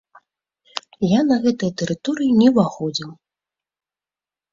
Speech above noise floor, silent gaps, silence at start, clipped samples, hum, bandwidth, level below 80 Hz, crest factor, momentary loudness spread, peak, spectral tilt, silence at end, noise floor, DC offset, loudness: over 72 dB; none; 0.75 s; under 0.1%; 50 Hz at -45 dBFS; 7.6 kHz; -60 dBFS; 18 dB; 17 LU; -2 dBFS; -6 dB/octave; 1.4 s; under -90 dBFS; under 0.1%; -19 LUFS